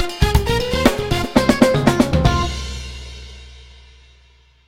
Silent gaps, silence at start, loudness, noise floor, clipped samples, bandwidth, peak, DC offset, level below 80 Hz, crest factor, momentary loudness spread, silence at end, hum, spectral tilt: none; 0 s; -17 LUFS; -52 dBFS; under 0.1%; 16.5 kHz; 0 dBFS; under 0.1%; -26 dBFS; 18 dB; 19 LU; 1.05 s; none; -5.5 dB/octave